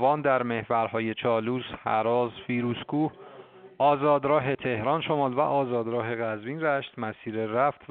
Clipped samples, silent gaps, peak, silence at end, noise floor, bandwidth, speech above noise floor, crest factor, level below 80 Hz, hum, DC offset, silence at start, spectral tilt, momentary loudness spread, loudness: under 0.1%; none; -10 dBFS; 0.05 s; -49 dBFS; 4.4 kHz; 22 dB; 16 dB; -66 dBFS; none; under 0.1%; 0 s; -4.5 dB/octave; 8 LU; -27 LUFS